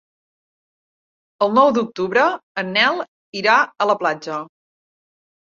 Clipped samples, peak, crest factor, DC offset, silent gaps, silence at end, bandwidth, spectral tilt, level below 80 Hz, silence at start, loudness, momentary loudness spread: under 0.1%; -2 dBFS; 20 dB; under 0.1%; 2.43-2.55 s, 3.08-3.33 s; 1.1 s; 7.4 kHz; -4.5 dB/octave; -66 dBFS; 1.4 s; -18 LUFS; 12 LU